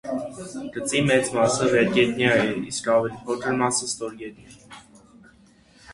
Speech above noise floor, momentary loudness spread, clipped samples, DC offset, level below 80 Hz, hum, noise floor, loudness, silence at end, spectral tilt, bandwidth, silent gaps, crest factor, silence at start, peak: 32 dB; 14 LU; under 0.1%; under 0.1%; -58 dBFS; none; -55 dBFS; -22 LUFS; 0 s; -4 dB/octave; 11.5 kHz; none; 20 dB; 0.05 s; -4 dBFS